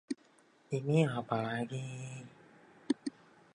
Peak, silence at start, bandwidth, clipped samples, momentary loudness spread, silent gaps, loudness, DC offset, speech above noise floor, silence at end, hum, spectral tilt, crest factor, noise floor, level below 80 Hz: -18 dBFS; 0.1 s; 10.5 kHz; under 0.1%; 15 LU; none; -36 LUFS; under 0.1%; 32 dB; 0.45 s; none; -7 dB/octave; 20 dB; -66 dBFS; -76 dBFS